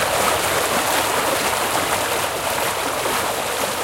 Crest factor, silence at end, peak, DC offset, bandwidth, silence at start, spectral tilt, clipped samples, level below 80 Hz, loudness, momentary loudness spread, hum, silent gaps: 16 dB; 0 s; -4 dBFS; under 0.1%; 17 kHz; 0 s; -1.5 dB/octave; under 0.1%; -46 dBFS; -19 LUFS; 3 LU; none; none